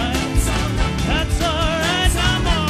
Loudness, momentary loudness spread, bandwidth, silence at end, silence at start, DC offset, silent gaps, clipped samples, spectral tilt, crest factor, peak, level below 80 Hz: -19 LUFS; 3 LU; 15.5 kHz; 0 s; 0 s; under 0.1%; none; under 0.1%; -4 dB/octave; 14 dB; -4 dBFS; -22 dBFS